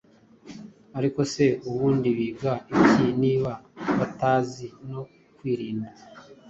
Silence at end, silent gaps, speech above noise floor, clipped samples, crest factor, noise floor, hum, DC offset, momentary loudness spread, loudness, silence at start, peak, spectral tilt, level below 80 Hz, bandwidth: 0 s; none; 24 dB; under 0.1%; 22 dB; -48 dBFS; none; under 0.1%; 19 LU; -24 LUFS; 0.45 s; -4 dBFS; -7 dB/octave; -58 dBFS; 8 kHz